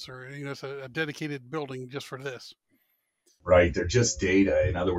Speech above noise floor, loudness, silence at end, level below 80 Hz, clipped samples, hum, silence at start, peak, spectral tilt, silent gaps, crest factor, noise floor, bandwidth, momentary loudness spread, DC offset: 47 dB; -27 LUFS; 0 s; -46 dBFS; under 0.1%; none; 0 s; -8 dBFS; -5 dB/octave; none; 20 dB; -74 dBFS; 13 kHz; 17 LU; under 0.1%